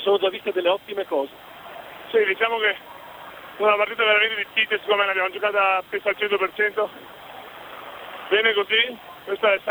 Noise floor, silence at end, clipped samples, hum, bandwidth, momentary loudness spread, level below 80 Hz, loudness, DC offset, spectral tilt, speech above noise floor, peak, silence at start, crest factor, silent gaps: -40 dBFS; 0 s; under 0.1%; none; over 20 kHz; 20 LU; -66 dBFS; -21 LUFS; under 0.1%; -3.5 dB/octave; 19 dB; -4 dBFS; 0 s; 18 dB; none